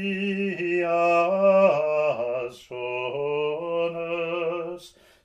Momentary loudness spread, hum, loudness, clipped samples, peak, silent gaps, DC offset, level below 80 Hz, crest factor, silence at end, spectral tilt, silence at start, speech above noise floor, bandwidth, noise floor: 12 LU; none; -24 LUFS; under 0.1%; -8 dBFS; none; under 0.1%; -68 dBFS; 16 dB; 0.35 s; -6.5 dB/octave; 0 s; 23 dB; 9.6 kHz; -46 dBFS